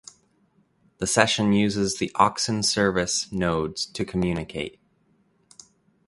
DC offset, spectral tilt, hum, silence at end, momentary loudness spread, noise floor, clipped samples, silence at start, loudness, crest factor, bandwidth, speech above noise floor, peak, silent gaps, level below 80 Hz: under 0.1%; -4 dB/octave; none; 1.4 s; 10 LU; -65 dBFS; under 0.1%; 1 s; -23 LUFS; 24 dB; 11.5 kHz; 41 dB; 0 dBFS; none; -50 dBFS